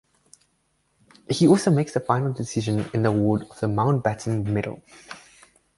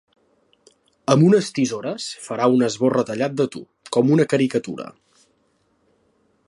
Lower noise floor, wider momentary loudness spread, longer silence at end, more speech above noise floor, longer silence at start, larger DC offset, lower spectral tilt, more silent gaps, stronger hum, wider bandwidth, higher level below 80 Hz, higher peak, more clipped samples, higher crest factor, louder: first, -69 dBFS vs -65 dBFS; first, 23 LU vs 14 LU; second, 0.6 s vs 1.55 s; about the same, 47 dB vs 46 dB; first, 1.3 s vs 1.1 s; neither; about the same, -6.5 dB/octave vs -6 dB/octave; neither; neither; about the same, 11.5 kHz vs 11.5 kHz; first, -54 dBFS vs -68 dBFS; about the same, -4 dBFS vs -2 dBFS; neither; about the same, 20 dB vs 20 dB; second, -23 LUFS vs -20 LUFS